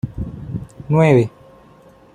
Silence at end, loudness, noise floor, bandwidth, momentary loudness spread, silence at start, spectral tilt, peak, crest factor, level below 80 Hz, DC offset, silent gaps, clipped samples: 0.85 s; -17 LUFS; -47 dBFS; 9.8 kHz; 17 LU; 0.05 s; -8.5 dB/octave; -2 dBFS; 18 dB; -42 dBFS; under 0.1%; none; under 0.1%